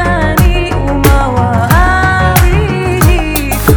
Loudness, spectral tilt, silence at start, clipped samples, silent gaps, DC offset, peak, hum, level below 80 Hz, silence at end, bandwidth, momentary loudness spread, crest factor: -10 LUFS; -5.5 dB/octave; 0 s; 1%; none; under 0.1%; 0 dBFS; none; -14 dBFS; 0 s; over 20 kHz; 4 LU; 8 dB